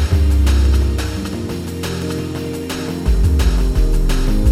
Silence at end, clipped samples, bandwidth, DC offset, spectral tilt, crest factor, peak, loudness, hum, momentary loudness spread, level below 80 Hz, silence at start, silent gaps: 0 s; under 0.1%; 15.5 kHz; under 0.1%; -6 dB/octave; 12 dB; -4 dBFS; -18 LUFS; none; 9 LU; -16 dBFS; 0 s; none